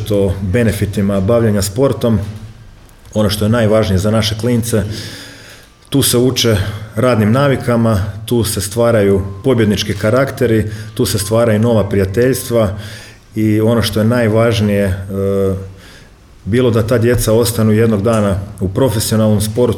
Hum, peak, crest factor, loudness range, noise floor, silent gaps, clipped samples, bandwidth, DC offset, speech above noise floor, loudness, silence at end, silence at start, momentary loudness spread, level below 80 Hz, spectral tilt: none; -2 dBFS; 12 dB; 2 LU; -40 dBFS; none; under 0.1%; 18 kHz; under 0.1%; 27 dB; -14 LUFS; 0 s; 0 s; 7 LU; -36 dBFS; -5.5 dB/octave